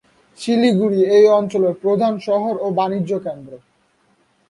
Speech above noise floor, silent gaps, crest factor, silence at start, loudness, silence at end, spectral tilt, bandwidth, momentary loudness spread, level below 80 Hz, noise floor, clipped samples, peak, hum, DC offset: 44 dB; none; 14 dB; 0.4 s; -17 LUFS; 0.95 s; -7 dB/octave; 11 kHz; 12 LU; -64 dBFS; -60 dBFS; under 0.1%; -2 dBFS; none; under 0.1%